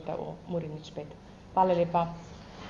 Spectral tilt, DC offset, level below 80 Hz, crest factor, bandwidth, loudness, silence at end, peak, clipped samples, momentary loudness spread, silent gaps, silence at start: -7.5 dB/octave; under 0.1%; -56 dBFS; 20 dB; 7.2 kHz; -30 LUFS; 0 s; -12 dBFS; under 0.1%; 20 LU; none; 0 s